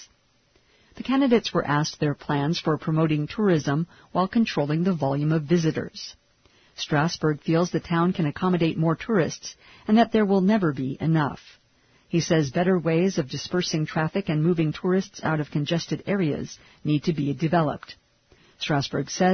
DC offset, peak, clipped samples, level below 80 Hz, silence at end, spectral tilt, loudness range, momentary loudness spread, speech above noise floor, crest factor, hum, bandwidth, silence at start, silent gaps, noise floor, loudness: under 0.1%; -6 dBFS; under 0.1%; -58 dBFS; 0 s; -6.5 dB/octave; 3 LU; 8 LU; 40 dB; 18 dB; none; 6.6 kHz; 0 s; none; -63 dBFS; -24 LUFS